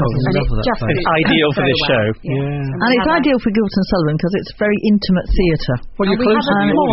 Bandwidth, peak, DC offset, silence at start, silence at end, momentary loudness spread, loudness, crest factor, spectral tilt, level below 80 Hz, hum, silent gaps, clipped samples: 6 kHz; -2 dBFS; under 0.1%; 0 s; 0 s; 6 LU; -16 LUFS; 12 dB; -4.5 dB/octave; -28 dBFS; none; none; under 0.1%